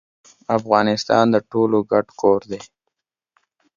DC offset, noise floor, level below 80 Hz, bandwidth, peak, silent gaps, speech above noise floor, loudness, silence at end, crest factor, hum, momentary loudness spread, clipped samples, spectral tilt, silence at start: under 0.1%; -78 dBFS; -60 dBFS; 7.4 kHz; 0 dBFS; none; 60 dB; -18 LUFS; 1.1 s; 20 dB; none; 13 LU; under 0.1%; -6 dB/octave; 0.5 s